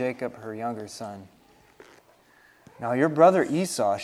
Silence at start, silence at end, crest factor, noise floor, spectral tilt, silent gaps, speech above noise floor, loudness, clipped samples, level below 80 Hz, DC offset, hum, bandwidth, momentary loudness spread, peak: 0 s; 0 s; 22 dB; -58 dBFS; -5.5 dB/octave; none; 34 dB; -24 LUFS; under 0.1%; -70 dBFS; under 0.1%; none; 14 kHz; 19 LU; -4 dBFS